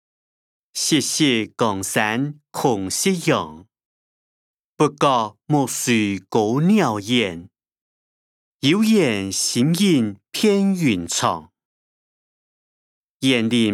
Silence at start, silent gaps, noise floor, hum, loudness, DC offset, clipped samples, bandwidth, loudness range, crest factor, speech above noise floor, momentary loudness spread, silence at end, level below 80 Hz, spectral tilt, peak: 0.75 s; 3.85-4.76 s, 7.81-8.60 s, 11.65-13.20 s; under -90 dBFS; none; -19 LUFS; under 0.1%; under 0.1%; 16.5 kHz; 4 LU; 18 dB; over 71 dB; 6 LU; 0 s; -66 dBFS; -4 dB/octave; -2 dBFS